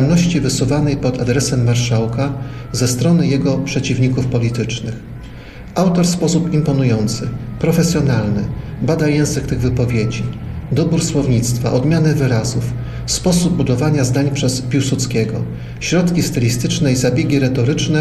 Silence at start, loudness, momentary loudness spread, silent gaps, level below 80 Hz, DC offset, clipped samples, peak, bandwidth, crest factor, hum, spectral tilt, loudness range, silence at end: 0 s; -16 LUFS; 9 LU; none; -34 dBFS; 0.4%; under 0.1%; -4 dBFS; 13.5 kHz; 12 dB; none; -5.5 dB/octave; 2 LU; 0 s